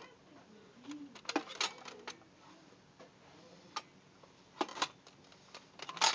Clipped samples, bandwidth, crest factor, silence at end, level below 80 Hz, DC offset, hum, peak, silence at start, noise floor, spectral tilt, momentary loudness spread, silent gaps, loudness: under 0.1%; 8 kHz; 28 dB; 0 s; -84 dBFS; under 0.1%; none; -14 dBFS; 0 s; -62 dBFS; -0.5 dB/octave; 22 LU; none; -41 LUFS